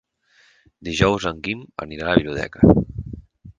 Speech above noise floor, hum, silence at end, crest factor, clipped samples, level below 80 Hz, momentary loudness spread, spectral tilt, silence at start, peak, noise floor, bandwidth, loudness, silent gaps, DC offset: 39 dB; none; 0.05 s; 22 dB; under 0.1%; -38 dBFS; 19 LU; -6.5 dB/octave; 0.8 s; 0 dBFS; -58 dBFS; 9.6 kHz; -20 LUFS; none; under 0.1%